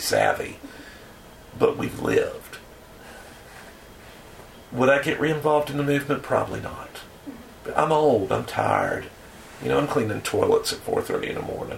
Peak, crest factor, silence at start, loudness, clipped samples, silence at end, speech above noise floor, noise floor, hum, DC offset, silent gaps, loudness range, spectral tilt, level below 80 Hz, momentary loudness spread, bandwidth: -4 dBFS; 22 dB; 0 s; -24 LUFS; under 0.1%; 0 s; 22 dB; -45 dBFS; none; under 0.1%; none; 5 LU; -5 dB/octave; -52 dBFS; 23 LU; 16.5 kHz